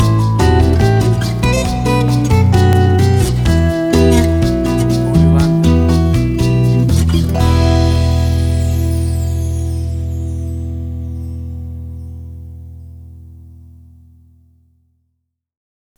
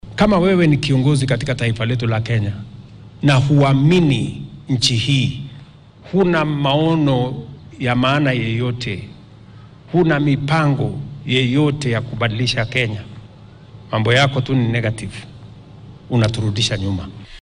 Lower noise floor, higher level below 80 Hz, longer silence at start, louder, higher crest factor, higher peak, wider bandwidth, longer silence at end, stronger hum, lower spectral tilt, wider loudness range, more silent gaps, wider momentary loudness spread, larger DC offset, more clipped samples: first, -70 dBFS vs -41 dBFS; first, -22 dBFS vs -42 dBFS; about the same, 0 s vs 0.05 s; first, -13 LUFS vs -17 LUFS; about the same, 14 dB vs 14 dB; first, 0 dBFS vs -4 dBFS; first, 17.5 kHz vs 10.5 kHz; first, 2.5 s vs 0 s; neither; about the same, -7 dB/octave vs -6 dB/octave; first, 15 LU vs 3 LU; neither; about the same, 15 LU vs 15 LU; neither; neither